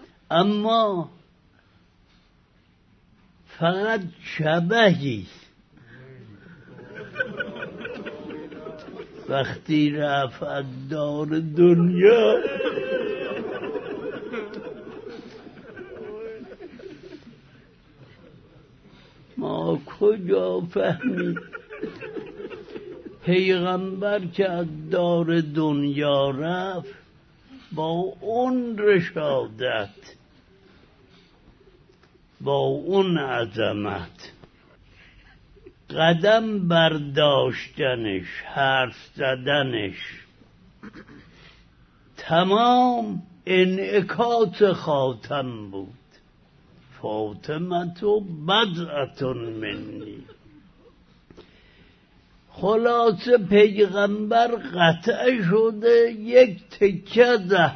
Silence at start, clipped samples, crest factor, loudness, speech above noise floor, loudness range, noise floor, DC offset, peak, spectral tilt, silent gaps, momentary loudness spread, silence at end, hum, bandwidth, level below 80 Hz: 0 s; under 0.1%; 22 dB; -22 LUFS; 38 dB; 14 LU; -59 dBFS; under 0.1%; -2 dBFS; -7 dB/octave; none; 20 LU; 0 s; none; 6.4 kHz; -60 dBFS